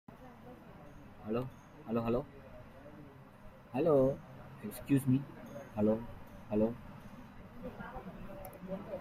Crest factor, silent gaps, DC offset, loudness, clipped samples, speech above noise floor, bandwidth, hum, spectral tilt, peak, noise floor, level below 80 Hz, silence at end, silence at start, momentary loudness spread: 20 dB; none; under 0.1%; -36 LUFS; under 0.1%; 21 dB; 16 kHz; none; -8.5 dB/octave; -16 dBFS; -54 dBFS; -58 dBFS; 0 s; 0.1 s; 23 LU